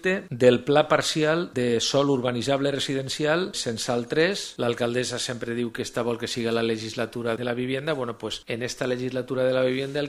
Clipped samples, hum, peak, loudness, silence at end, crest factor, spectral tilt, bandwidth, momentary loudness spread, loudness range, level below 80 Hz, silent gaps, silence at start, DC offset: under 0.1%; none; -4 dBFS; -25 LUFS; 0 s; 22 dB; -4.5 dB/octave; 14.5 kHz; 8 LU; 5 LU; -60 dBFS; none; 0.05 s; under 0.1%